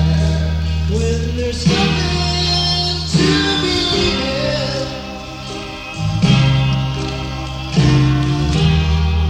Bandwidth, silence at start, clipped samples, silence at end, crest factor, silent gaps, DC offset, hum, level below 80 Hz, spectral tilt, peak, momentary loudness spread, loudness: 10.5 kHz; 0 s; under 0.1%; 0 s; 14 dB; none; under 0.1%; none; -24 dBFS; -5.5 dB/octave; -2 dBFS; 11 LU; -16 LUFS